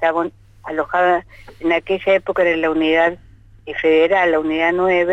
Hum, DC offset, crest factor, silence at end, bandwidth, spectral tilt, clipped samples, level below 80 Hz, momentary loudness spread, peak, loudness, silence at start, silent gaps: none; under 0.1%; 12 dB; 0 s; 8 kHz; -6 dB/octave; under 0.1%; -48 dBFS; 11 LU; -4 dBFS; -17 LUFS; 0 s; none